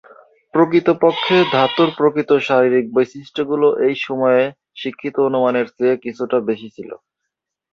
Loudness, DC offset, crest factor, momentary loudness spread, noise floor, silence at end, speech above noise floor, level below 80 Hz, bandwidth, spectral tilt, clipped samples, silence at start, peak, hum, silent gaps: -17 LUFS; under 0.1%; 16 dB; 11 LU; -79 dBFS; 0.75 s; 63 dB; -62 dBFS; 7 kHz; -6.5 dB/octave; under 0.1%; 0.55 s; -2 dBFS; none; none